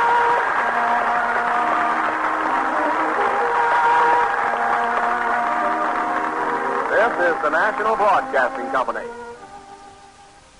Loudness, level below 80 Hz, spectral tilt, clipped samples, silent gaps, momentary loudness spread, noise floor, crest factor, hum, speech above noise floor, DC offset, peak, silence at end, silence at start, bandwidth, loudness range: -19 LUFS; -56 dBFS; -3.5 dB/octave; under 0.1%; none; 5 LU; -47 dBFS; 14 dB; none; 27 dB; under 0.1%; -6 dBFS; 0.55 s; 0 s; 11 kHz; 2 LU